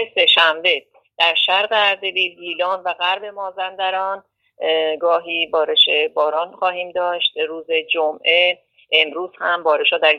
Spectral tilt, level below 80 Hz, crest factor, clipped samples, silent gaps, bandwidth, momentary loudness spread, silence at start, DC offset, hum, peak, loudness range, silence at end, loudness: -2 dB/octave; -72 dBFS; 18 dB; under 0.1%; none; 11 kHz; 11 LU; 0 s; under 0.1%; none; 0 dBFS; 4 LU; 0 s; -17 LUFS